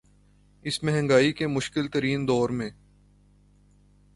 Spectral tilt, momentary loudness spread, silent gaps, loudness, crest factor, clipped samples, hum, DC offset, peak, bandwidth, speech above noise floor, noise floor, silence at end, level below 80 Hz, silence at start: -5.5 dB/octave; 11 LU; none; -25 LUFS; 20 dB; under 0.1%; 50 Hz at -45 dBFS; under 0.1%; -8 dBFS; 11.5 kHz; 34 dB; -59 dBFS; 1.45 s; -56 dBFS; 0.65 s